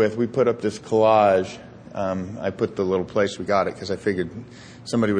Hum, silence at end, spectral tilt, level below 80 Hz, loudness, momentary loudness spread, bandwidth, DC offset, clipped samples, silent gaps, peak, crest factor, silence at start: none; 0 s; -6 dB/octave; -58 dBFS; -22 LUFS; 17 LU; 10 kHz; under 0.1%; under 0.1%; none; -6 dBFS; 16 dB; 0 s